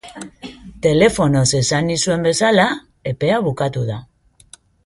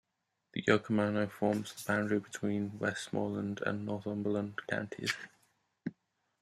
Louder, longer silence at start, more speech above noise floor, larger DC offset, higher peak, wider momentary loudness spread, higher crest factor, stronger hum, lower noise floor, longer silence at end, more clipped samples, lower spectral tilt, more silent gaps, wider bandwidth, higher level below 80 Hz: first, -17 LUFS vs -35 LUFS; second, 0.05 s vs 0.55 s; second, 31 dB vs 50 dB; neither; first, -2 dBFS vs -12 dBFS; first, 20 LU vs 12 LU; second, 16 dB vs 24 dB; neither; second, -48 dBFS vs -84 dBFS; first, 0.8 s vs 0.5 s; neither; about the same, -4.5 dB/octave vs -5.5 dB/octave; neither; second, 11.5 kHz vs 14.5 kHz; first, -44 dBFS vs -76 dBFS